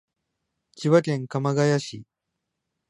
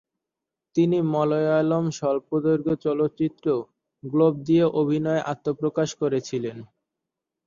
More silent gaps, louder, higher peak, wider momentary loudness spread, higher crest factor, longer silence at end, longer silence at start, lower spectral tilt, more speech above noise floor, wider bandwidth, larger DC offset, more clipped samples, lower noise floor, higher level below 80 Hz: neither; about the same, -23 LUFS vs -24 LUFS; about the same, -6 dBFS vs -8 dBFS; first, 14 LU vs 8 LU; about the same, 20 dB vs 16 dB; about the same, 0.85 s vs 0.8 s; about the same, 0.75 s vs 0.75 s; about the same, -6.5 dB/octave vs -7.5 dB/octave; second, 59 dB vs 64 dB; first, 11 kHz vs 7.4 kHz; neither; neither; second, -82 dBFS vs -87 dBFS; second, -70 dBFS vs -64 dBFS